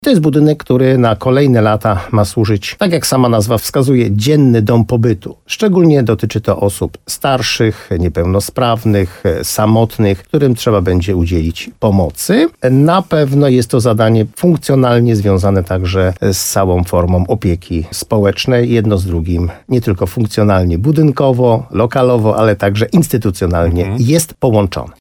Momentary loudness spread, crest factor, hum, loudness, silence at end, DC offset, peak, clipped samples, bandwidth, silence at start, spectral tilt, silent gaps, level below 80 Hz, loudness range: 6 LU; 12 dB; none; -12 LUFS; 0.1 s; under 0.1%; 0 dBFS; under 0.1%; 19 kHz; 0 s; -6.5 dB/octave; none; -32 dBFS; 2 LU